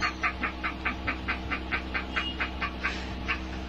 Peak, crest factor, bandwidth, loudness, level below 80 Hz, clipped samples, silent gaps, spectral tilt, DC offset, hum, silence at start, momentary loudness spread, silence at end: -14 dBFS; 18 dB; 8.2 kHz; -31 LUFS; -40 dBFS; under 0.1%; none; -4.5 dB/octave; under 0.1%; none; 0 s; 3 LU; 0 s